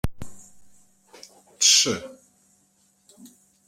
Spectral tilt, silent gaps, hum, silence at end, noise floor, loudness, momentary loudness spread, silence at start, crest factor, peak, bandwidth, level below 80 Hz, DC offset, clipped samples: -1 dB/octave; none; none; 0.4 s; -64 dBFS; -19 LUFS; 28 LU; 0.05 s; 24 dB; -4 dBFS; 16 kHz; -46 dBFS; under 0.1%; under 0.1%